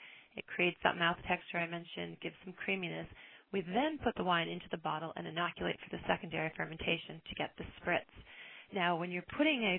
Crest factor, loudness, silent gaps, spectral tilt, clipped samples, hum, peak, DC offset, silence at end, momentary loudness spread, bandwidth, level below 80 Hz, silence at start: 24 dB; -37 LUFS; none; -8.5 dB/octave; under 0.1%; none; -12 dBFS; under 0.1%; 0 s; 13 LU; 4.2 kHz; -64 dBFS; 0 s